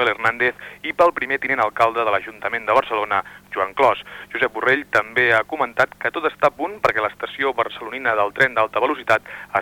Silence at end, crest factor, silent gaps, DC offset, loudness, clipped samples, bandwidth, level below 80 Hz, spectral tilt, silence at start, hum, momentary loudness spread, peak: 0 s; 16 dB; none; under 0.1%; -20 LUFS; under 0.1%; 19 kHz; -56 dBFS; -4.5 dB/octave; 0 s; none; 7 LU; -4 dBFS